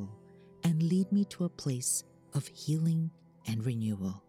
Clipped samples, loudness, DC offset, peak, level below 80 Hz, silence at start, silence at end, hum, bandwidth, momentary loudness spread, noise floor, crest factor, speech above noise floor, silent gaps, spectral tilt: under 0.1%; -32 LUFS; under 0.1%; -20 dBFS; -72 dBFS; 0 s; 0.1 s; none; 15.5 kHz; 9 LU; -55 dBFS; 12 dB; 24 dB; none; -6 dB/octave